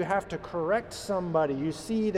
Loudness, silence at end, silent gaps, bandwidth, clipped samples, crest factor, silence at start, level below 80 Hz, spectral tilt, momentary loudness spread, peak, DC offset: -30 LUFS; 0 s; none; 14 kHz; under 0.1%; 16 dB; 0 s; -56 dBFS; -6 dB/octave; 5 LU; -14 dBFS; under 0.1%